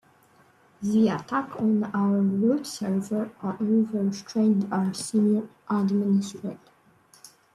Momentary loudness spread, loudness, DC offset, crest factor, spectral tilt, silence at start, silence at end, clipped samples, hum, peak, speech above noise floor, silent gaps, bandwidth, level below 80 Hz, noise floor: 7 LU; -25 LUFS; under 0.1%; 14 dB; -7 dB/octave; 0.8 s; 1 s; under 0.1%; none; -12 dBFS; 34 dB; none; 12.5 kHz; -70 dBFS; -59 dBFS